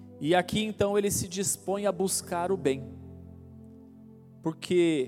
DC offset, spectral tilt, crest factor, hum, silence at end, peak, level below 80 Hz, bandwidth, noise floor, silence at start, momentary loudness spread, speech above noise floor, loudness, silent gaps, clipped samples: under 0.1%; -4 dB/octave; 18 dB; none; 0 s; -12 dBFS; -62 dBFS; 16.5 kHz; -51 dBFS; 0 s; 22 LU; 23 dB; -28 LUFS; none; under 0.1%